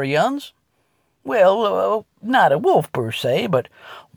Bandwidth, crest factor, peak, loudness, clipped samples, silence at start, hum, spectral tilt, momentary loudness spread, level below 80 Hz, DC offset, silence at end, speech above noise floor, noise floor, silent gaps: over 20 kHz; 16 dB; -4 dBFS; -18 LUFS; under 0.1%; 0 s; none; -5.5 dB/octave; 10 LU; -64 dBFS; under 0.1%; 0.15 s; 48 dB; -66 dBFS; none